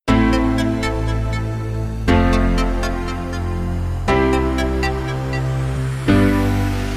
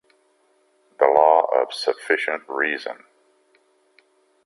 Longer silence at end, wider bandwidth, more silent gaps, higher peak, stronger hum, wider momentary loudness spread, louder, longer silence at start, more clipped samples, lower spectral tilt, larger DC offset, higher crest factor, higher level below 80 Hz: second, 0 s vs 1.5 s; first, 15 kHz vs 11.5 kHz; neither; about the same, -2 dBFS vs -2 dBFS; neither; second, 8 LU vs 13 LU; about the same, -19 LUFS vs -20 LUFS; second, 0.05 s vs 1 s; neither; first, -7 dB/octave vs -2.5 dB/octave; neither; second, 14 dB vs 22 dB; first, -24 dBFS vs -76 dBFS